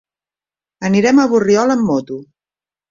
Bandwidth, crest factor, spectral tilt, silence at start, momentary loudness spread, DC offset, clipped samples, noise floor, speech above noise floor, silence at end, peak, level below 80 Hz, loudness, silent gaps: 7.6 kHz; 14 dB; -6 dB/octave; 0.8 s; 15 LU; under 0.1%; under 0.1%; under -90 dBFS; over 77 dB; 0.65 s; -2 dBFS; -56 dBFS; -14 LUFS; none